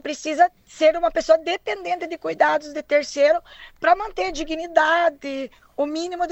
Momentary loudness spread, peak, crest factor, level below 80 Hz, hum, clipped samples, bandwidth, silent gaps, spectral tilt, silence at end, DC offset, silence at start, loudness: 9 LU; -2 dBFS; 18 dB; -50 dBFS; none; under 0.1%; 8.4 kHz; none; -2.5 dB/octave; 0 s; under 0.1%; 0.05 s; -21 LUFS